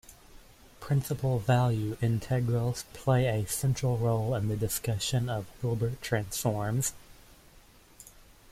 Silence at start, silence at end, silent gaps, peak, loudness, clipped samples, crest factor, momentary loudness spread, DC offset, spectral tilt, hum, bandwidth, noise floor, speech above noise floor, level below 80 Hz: 0.1 s; 0.4 s; none; -14 dBFS; -30 LUFS; under 0.1%; 16 dB; 7 LU; under 0.1%; -5.5 dB/octave; none; 16 kHz; -57 dBFS; 28 dB; -52 dBFS